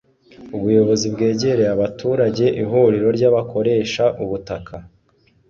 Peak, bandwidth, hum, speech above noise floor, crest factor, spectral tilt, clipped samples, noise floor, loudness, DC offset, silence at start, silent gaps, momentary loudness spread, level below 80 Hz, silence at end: -4 dBFS; 7.4 kHz; none; 41 dB; 14 dB; -6 dB/octave; under 0.1%; -58 dBFS; -18 LUFS; under 0.1%; 0.4 s; none; 13 LU; -50 dBFS; 0.65 s